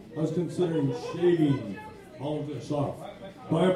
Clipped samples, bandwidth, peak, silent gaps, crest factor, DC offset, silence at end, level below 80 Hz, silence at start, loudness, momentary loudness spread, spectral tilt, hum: under 0.1%; 11.5 kHz; -12 dBFS; none; 16 dB; under 0.1%; 0 s; -62 dBFS; 0 s; -29 LUFS; 16 LU; -7.5 dB/octave; none